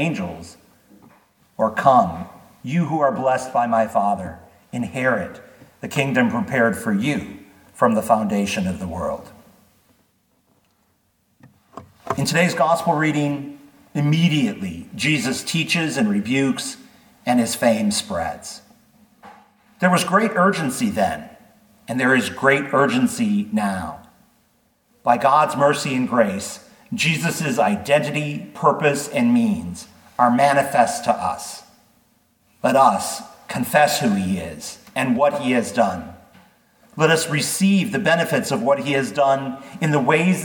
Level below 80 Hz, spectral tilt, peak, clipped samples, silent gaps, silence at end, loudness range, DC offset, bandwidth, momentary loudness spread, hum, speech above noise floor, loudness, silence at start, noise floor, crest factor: -56 dBFS; -5 dB/octave; -2 dBFS; under 0.1%; none; 0 s; 4 LU; under 0.1%; 19 kHz; 15 LU; none; 45 dB; -20 LUFS; 0 s; -65 dBFS; 20 dB